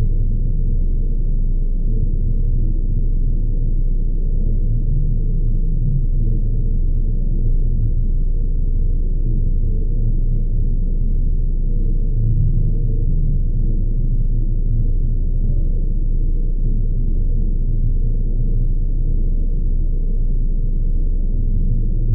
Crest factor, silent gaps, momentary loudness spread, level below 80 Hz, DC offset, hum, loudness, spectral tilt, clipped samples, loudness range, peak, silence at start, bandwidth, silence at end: 8 dB; none; 2 LU; -16 dBFS; under 0.1%; none; -23 LUFS; -17 dB/octave; under 0.1%; 1 LU; -6 dBFS; 0 s; 0.7 kHz; 0 s